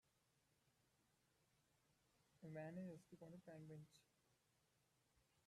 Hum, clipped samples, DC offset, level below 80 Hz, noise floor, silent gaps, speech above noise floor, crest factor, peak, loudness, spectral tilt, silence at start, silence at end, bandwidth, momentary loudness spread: none; under 0.1%; under 0.1%; under -90 dBFS; -84 dBFS; none; 26 dB; 18 dB; -44 dBFS; -59 LUFS; -7 dB/octave; 1.9 s; 0.05 s; 13 kHz; 9 LU